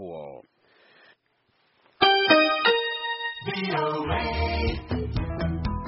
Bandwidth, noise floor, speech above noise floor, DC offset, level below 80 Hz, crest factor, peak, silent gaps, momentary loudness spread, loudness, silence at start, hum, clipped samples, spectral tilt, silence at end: 5.8 kHz; -69 dBFS; 42 dB; under 0.1%; -38 dBFS; 22 dB; -6 dBFS; none; 12 LU; -24 LUFS; 0 s; none; under 0.1%; -2.5 dB/octave; 0 s